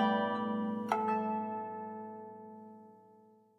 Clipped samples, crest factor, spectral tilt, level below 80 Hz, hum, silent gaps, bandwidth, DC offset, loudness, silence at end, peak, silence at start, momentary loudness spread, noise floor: under 0.1%; 20 dB; -7 dB/octave; under -90 dBFS; none; none; 11 kHz; under 0.1%; -36 LUFS; 0.45 s; -16 dBFS; 0 s; 19 LU; -62 dBFS